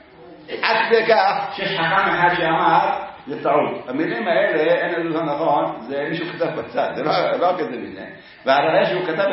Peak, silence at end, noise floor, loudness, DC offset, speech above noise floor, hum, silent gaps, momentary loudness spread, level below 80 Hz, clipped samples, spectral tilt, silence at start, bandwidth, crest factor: 0 dBFS; 0 s; -42 dBFS; -19 LUFS; under 0.1%; 23 dB; none; none; 10 LU; -60 dBFS; under 0.1%; -9 dB/octave; 0.2 s; 5.8 kHz; 20 dB